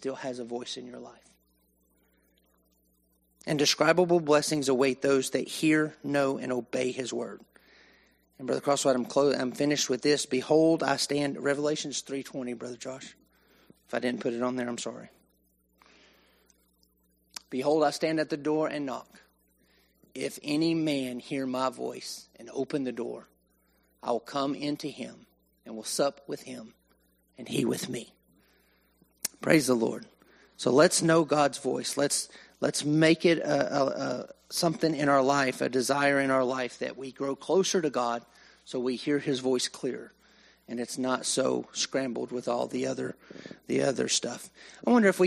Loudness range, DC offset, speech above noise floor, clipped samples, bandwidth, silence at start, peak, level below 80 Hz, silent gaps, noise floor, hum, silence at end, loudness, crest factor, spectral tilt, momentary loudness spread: 9 LU; under 0.1%; 41 dB; under 0.1%; 15 kHz; 0 s; -6 dBFS; -72 dBFS; none; -70 dBFS; none; 0 s; -28 LUFS; 22 dB; -4 dB/octave; 16 LU